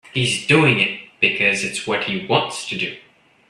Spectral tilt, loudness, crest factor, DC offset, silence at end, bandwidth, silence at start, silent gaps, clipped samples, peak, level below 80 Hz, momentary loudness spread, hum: -4 dB/octave; -18 LUFS; 20 dB; under 0.1%; 0.5 s; 13 kHz; 0.15 s; none; under 0.1%; 0 dBFS; -58 dBFS; 10 LU; none